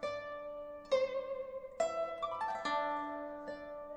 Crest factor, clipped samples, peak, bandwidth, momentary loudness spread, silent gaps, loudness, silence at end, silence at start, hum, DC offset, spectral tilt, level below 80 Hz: 18 dB; under 0.1%; -20 dBFS; 9.4 kHz; 11 LU; none; -39 LUFS; 0 s; 0 s; none; under 0.1%; -3.5 dB/octave; -68 dBFS